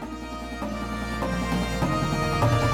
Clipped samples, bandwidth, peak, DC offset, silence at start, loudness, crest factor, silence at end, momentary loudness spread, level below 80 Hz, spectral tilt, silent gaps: under 0.1%; 17 kHz; -10 dBFS; under 0.1%; 0 s; -27 LUFS; 14 dB; 0 s; 11 LU; -36 dBFS; -6 dB/octave; none